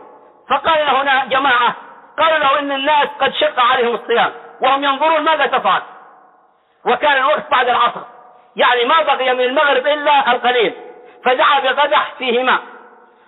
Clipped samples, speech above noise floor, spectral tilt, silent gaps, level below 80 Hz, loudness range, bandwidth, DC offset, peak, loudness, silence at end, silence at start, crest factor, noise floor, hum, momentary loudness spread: under 0.1%; 39 dB; -6 dB/octave; none; -62 dBFS; 2 LU; 4.2 kHz; under 0.1%; -4 dBFS; -14 LUFS; 0.5 s; 0 s; 12 dB; -54 dBFS; none; 6 LU